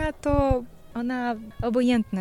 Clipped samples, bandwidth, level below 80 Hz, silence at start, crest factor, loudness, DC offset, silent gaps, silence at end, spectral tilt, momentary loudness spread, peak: under 0.1%; 11.5 kHz; -36 dBFS; 0 s; 16 dB; -25 LUFS; under 0.1%; none; 0 s; -7 dB/octave; 9 LU; -10 dBFS